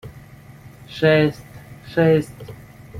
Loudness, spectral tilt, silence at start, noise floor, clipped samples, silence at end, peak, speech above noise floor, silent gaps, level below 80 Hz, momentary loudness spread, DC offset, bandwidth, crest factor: -18 LUFS; -7.5 dB/octave; 0.05 s; -43 dBFS; under 0.1%; 0 s; -2 dBFS; 25 dB; none; -50 dBFS; 25 LU; under 0.1%; 15.5 kHz; 20 dB